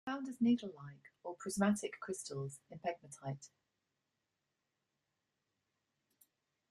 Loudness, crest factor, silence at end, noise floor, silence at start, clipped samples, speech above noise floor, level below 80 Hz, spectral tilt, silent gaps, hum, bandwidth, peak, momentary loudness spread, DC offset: -39 LUFS; 22 dB; 3.25 s; -88 dBFS; 0.05 s; under 0.1%; 48 dB; -80 dBFS; -5.5 dB/octave; none; none; 13.5 kHz; -20 dBFS; 17 LU; under 0.1%